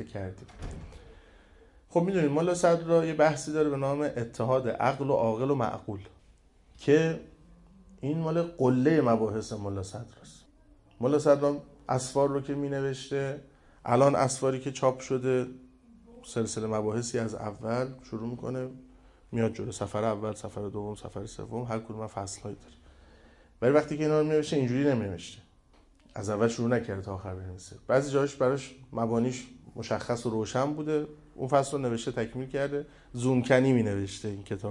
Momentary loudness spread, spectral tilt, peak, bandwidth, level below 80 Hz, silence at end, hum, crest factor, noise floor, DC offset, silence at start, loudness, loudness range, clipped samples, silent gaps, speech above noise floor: 16 LU; -6.5 dB/octave; -8 dBFS; 11.5 kHz; -58 dBFS; 0 s; none; 20 dB; -60 dBFS; under 0.1%; 0 s; -29 LUFS; 6 LU; under 0.1%; none; 32 dB